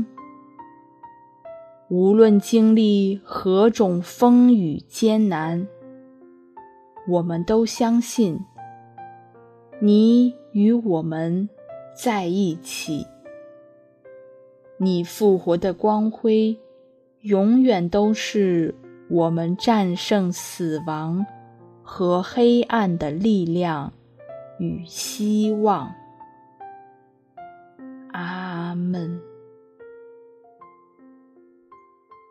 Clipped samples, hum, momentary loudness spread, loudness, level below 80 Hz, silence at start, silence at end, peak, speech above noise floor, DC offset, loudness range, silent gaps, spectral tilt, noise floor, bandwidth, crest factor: under 0.1%; none; 20 LU; -20 LUFS; -60 dBFS; 0 s; 2.4 s; -2 dBFS; 36 dB; under 0.1%; 13 LU; none; -6.5 dB/octave; -55 dBFS; 14 kHz; 20 dB